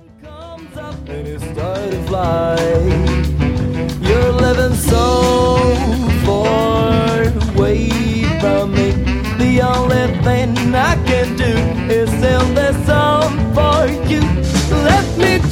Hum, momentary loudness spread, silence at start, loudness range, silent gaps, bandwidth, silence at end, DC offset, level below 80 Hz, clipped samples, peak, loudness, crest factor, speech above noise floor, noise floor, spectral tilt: none; 8 LU; 0.2 s; 3 LU; none; 16.5 kHz; 0 s; under 0.1%; -22 dBFS; under 0.1%; 0 dBFS; -14 LUFS; 14 dB; 20 dB; -35 dBFS; -6 dB/octave